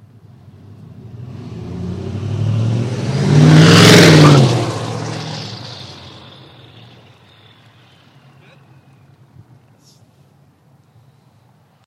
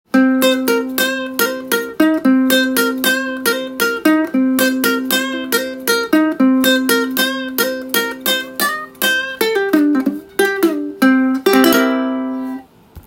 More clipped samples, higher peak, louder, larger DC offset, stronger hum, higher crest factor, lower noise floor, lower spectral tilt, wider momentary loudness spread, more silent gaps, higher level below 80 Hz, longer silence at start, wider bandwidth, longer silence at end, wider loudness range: first, 0.1% vs under 0.1%; about the same, 0 dBFS vs 0 dBFS; first, -11 LUFS vs -15 LUFS; neither; neither; about the same, 16 dB vs 16 dB; first, -52 dBFS vs -37 dBFS; first, -5.5 dB/octave vs -2.5 dB/octave; first, 27 LU vs 6 LU; neither; first, -48 dBFS vs -56 dBFS; first, 1.05 s vs 0.15 s; about the same, 15.5 kHz vs 17 kHz; first, 5.75 s vs 0.05 s; first, 19 LU vs 2 LU